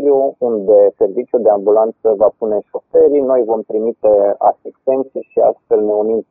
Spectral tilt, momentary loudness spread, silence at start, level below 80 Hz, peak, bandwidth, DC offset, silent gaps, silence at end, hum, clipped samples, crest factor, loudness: -11 dB/octave; 8 LU; 0 s; -56 dBFS; 0 dBFS; 2.8 kHz; under 0.1%; none; 0.1 s; none; under 0.1%; 12 dB; -14 LUFS